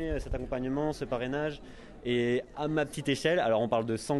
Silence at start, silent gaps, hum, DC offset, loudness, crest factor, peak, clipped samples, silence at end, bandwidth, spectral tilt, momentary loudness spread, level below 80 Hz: 0 s; none; none; under 0.1%; -31 LUFS; 18 dB; -12 dBFS; under 0.1%; 0 s; 12.5 kHz; -5.5 dB/octave; 9 LU; -46 dBFS